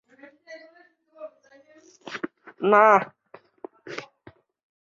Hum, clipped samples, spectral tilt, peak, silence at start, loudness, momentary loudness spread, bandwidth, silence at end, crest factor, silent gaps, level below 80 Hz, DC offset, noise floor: none; under 0.1%; -5.5 dB/octave; -4 dBFS; 0.5 s; -20 LUFS; 29 LU; 7.4 kHz; 0.85 s; 22 dB; none; -76 dBFS; under 0.1%; -57 dBFS